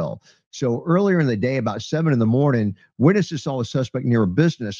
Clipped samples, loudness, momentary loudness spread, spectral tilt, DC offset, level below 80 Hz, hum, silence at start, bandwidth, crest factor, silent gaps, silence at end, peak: under 0.1%; -20 LUFS; 8 LU; -7.5 dB/octave; under 0.1%; -56 dBFS; none; 0 s; 7.4 kHz; 18 dB; 0.46-0.51 s; 0 s; -2 dBFS